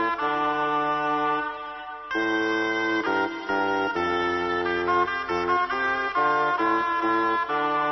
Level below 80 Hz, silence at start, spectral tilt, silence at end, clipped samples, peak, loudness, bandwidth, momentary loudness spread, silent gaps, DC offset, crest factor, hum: -58 dBFS; 0 s; -5 dB/octave; 0 s; under 0.1%; -12 dBFS; -24 LUFS; 6.2 kHz; 4 LU; none; under 0.1%; 14 dB; none